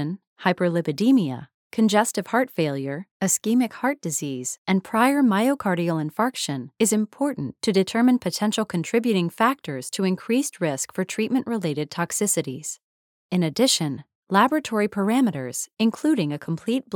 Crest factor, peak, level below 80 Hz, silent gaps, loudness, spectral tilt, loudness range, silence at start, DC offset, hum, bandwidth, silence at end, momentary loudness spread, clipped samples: 20 dB; -4 dBFS; -70 dBFS; 0.27-0.36 s, 1.54-1.70 s, 3.11-3.20 s, 4.58-4.65 s, 12.83-13.29 s, 14.15-14.23 s, 15.73-15.77 s; -23 LUFS; -4.5 dB/octave; 2 LU; 0 s; under 0.1%; none; 19.5 kHz; 0 s; 9 LU; under 0.1%